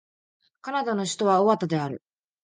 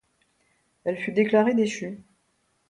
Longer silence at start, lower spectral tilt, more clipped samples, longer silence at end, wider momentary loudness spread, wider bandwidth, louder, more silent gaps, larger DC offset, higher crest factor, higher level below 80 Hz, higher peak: second, 0.65 s vs 0.85 s; about the same, -5.5 dB/octave vs -6 dB/octave; neither; second, 0.45 s vs 0.7 s; about the same, 16 LU vs 15 LU; about the same, 9.8 kHz vs 10.5 kHz; about the same, -25 LUFS vs -24 LUFS; neither; neither; about the same, 18 dB vs 20 dB; about the same, -72 dBFS vs -70 dBFS; about the same, -8 dBFS vs -8 dBFS